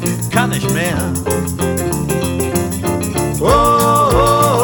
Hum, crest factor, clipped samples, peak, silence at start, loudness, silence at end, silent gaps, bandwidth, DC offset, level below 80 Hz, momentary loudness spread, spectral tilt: none; 14 dB; under 0.1%; 0 dBFS; 0 s; -15 LUFS; 0 s; none; over 20 kHz; under 0.1%; -30 dBFS; 7 LU; -5 dB/octave